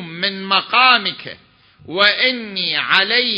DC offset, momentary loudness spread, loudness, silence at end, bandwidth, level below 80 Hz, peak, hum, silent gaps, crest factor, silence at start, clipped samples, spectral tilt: under 0.1%; 14 LU; -14 LUFS; 0 s; 8 kHz; -62 dBFS; 0 dBFS; none; none; 18 dB; 0 s; under 0.1%; -4.5 dB/octave